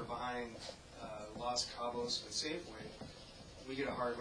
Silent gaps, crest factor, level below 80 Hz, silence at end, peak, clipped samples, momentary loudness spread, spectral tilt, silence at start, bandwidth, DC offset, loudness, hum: none; 20 dB; -62 dBFS; 0 s; -22 dBFS; under 0.1%; 14 LU; -3 dB/octave; 0 s; 11 kHz; under 0.1%; -42 LUFS; none